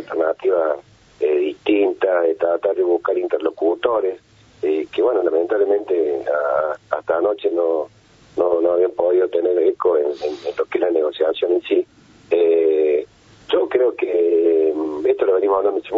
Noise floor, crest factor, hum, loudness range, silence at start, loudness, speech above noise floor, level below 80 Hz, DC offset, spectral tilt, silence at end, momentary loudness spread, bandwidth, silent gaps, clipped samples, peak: -38 dBFS; 16 dB; none; 2 LU; 0 s; -19 LUFS; 20 dB; -62 dBFS; under 0.1%; -6 dB/octave; 0 s; 7 LU; 6.8 kHz; none; under 0.1%; -2 dBFS